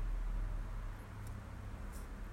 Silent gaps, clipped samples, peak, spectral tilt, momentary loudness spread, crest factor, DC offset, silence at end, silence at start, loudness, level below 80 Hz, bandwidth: none; under 0.1%; -30 dBFS; -6.5 dB/octave; 6 LU; 12 dB; under 0.1%; 0 s; 0 s; -47 LUFS; -42 dBFS; 13.5 kHz